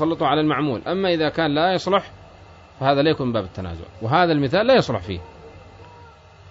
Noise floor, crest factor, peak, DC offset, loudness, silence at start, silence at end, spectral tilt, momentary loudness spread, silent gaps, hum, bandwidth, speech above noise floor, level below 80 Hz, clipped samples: -46 dBFS; 18 dB; -4 dBFS; under 0.1%; -20 LUFS; 0 s; 0.45 s; -6.5 dB/octave; 14 LU; none; none; 7.8 kHz; 26 dB; -50 dBFS; under 0.1%